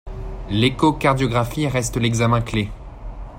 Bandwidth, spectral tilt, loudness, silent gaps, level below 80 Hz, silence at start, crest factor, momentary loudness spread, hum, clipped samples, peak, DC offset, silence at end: 16 kHz; -5.5 dB/octave; -20 LUFS; none; -34 dBFS; 0.05 s; 18 dB; 17 LU; none; under 0.1%; -4 dBFS; under 0.1%; 0 s